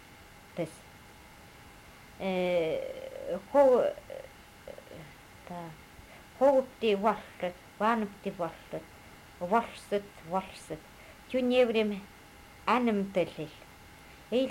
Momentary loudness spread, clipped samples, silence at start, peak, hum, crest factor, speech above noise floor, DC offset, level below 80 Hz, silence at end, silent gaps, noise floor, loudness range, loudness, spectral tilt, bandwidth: 26 LU; under 0.1%; 0.1 s; -12 dBFS; none; 20 dB; 23 dB; under 0.1%; -62 dBFS; 0 s; none; -53 dBFS; 5 LU; -30 LUFS; -6 dB/octave; 16 kHz